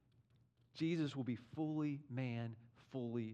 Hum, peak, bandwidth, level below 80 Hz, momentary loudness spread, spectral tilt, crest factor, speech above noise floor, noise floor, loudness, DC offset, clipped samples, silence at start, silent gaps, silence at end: none; -30 dBFS; 8.8 kHz; -84 dBFS; 11 LU; -8 dB/octave; 14 dB; 32 dB; -74 dBFS; -43 LUFS; under 0.1%; under 0.1%; 0.75 s; none; 0 s